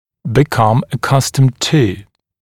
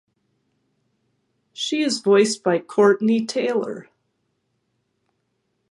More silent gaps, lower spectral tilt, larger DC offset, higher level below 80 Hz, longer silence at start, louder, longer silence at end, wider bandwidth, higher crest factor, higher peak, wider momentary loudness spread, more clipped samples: neither; about the same, -5.5 dB/octave vs -4.5 dB/octave; neither; first, -42 dBFS vs -76 dBFS; second, 0.25 s vs 1.55 s; first, -14 LUFS vs -20 LUFS; second, 0.4 s vs 1.9 s; first, 16.5 kHz vs 11.5 kHz; second, 14 dB vs 20 dB; first, 0 dBFS vs -4 dBFS; second, 5 LU vs 11 LU; neither